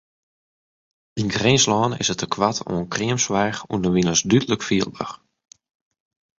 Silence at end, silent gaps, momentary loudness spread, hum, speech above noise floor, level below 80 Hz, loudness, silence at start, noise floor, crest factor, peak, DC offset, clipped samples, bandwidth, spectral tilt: 1.25 s; none; 11 LU; none; over 69 dB; -50 dBFS; -20 LUFS; 1.15 s; under -90 dBFS; 20 dB; -2 dBFS; under 0.1%; under 0.1%; 7.8 kHz; -4 dB/octave